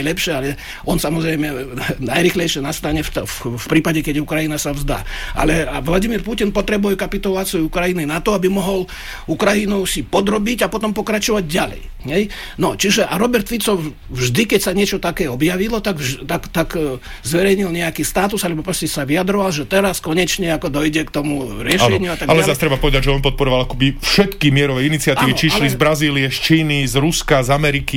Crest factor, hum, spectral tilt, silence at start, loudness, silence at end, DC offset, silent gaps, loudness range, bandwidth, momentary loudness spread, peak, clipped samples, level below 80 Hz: 14 dB; none; -4.5 dB/octave; 0 s; -17 LUFS; 0 s; 0.4%; none; 4 LU; 17 kHz; 8 LU; -2 dBFS; under 0.1%; -30 dBFS